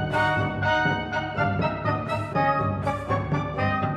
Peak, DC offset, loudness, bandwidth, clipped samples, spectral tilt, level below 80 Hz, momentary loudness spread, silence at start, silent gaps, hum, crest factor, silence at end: -10 dBFS; under 0.1%; -25 LUFS; 10.5 kHz; under 0.1%; -7 dB/octave; -46 dBFS; 4 LU; 0 s; none; none; 14 dB; 0 s